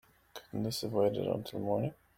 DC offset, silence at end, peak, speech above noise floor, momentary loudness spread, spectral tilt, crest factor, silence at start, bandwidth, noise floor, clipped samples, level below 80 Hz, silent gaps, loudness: under 0.1%; 0.25 s; -16 dBFS; 21 dB; 14 LU; -6 dB/octave; 18 dB; 0.35 s; 16.5 kHz; -54 dBFS; under 0.1%; -66 dBFS; none; -34 LUFS